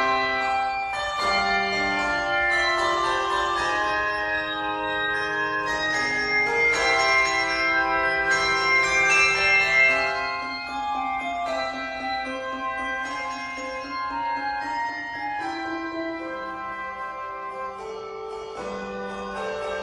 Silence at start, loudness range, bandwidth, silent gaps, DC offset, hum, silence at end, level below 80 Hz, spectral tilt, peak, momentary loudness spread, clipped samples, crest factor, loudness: 0 s; 12 LU; 12.5 kHz; none; under 0.1%; none; 0 s; -52 dBFS; -2 dB/octave; -6 dBFS; 14 LU; under 0.1%; 18 dB; -23 LUFS